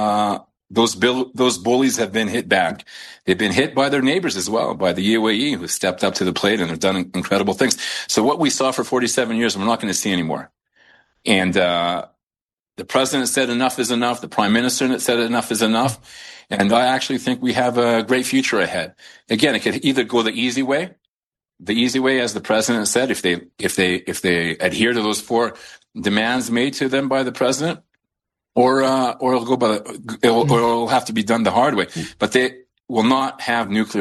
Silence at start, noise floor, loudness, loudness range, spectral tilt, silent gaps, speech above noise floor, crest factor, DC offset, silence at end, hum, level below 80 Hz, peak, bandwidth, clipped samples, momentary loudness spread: 0 s; under -90 dBFS; -19 LUFS; 2 LU; -3.5 dB/octave; 12.23-12.27 s, 12.42-12.57 s, 21.08-21.31 s; over 71 dB; 18 dB; under 0.1%; 0 s; none; -58 dBFS; 0 dBFS; 12.5 kHz; under 0.1%; 7 LU